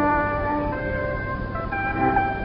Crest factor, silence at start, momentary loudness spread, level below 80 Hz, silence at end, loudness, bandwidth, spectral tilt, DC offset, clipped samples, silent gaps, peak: 16 dB; 0 s; 7 LU; -36 dBFS; 0 s; -24 LUFS; 5.6 kHz; -11.5 dB/octave; under 0.1%; under 0.1%; none; -8 dBFS